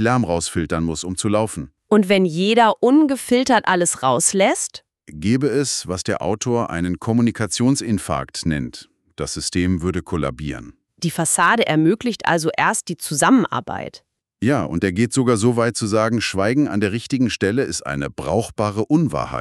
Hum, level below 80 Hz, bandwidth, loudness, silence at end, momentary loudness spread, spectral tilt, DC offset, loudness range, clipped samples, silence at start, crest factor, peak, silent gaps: none; -46 dBFS; 13.5 kHz; -19 LUFS; 0 s; 10 LU; -4.5 dB/octave; under 0.1%; 5 LU; under 0.1%; 0 s; 16 dB; -2 dBFS; none